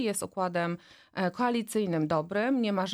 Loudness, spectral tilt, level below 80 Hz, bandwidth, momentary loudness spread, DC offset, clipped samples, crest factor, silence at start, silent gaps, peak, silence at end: -30 LUFS; -5 dB/octave; -70 dBFS; 19.5 kHz; 6 LU; under 0.1%; under 0.1%; 14 dB; 0 s; none; -16 dBFS; 0 s